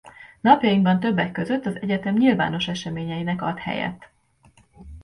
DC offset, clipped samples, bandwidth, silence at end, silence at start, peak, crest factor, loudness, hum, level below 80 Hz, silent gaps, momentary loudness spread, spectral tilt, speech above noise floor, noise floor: under 0.1%; under 0.1%; 10.5 kHz; 0 s; 0.05 s; -2 dBFS; 20 dB; -22 LUFS; none; -52 dBFS; none; 11 LU; -6.5 dB/octave; 35 dB; -57 dBFS